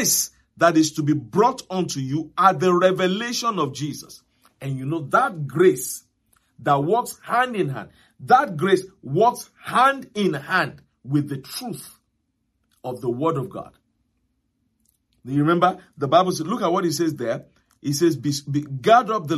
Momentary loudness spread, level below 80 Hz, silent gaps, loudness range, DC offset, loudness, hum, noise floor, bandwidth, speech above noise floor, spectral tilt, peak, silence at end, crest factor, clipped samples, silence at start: 13 LU; -64 dBFS; none; 8 LU; under 0.1%; -21 LUFS; none; -72 dBFS; 15 kHz; 51 dB; -4.5 dB/octave; -2 dBFS; 0 s; 20 dB; under 0.1%; 0 s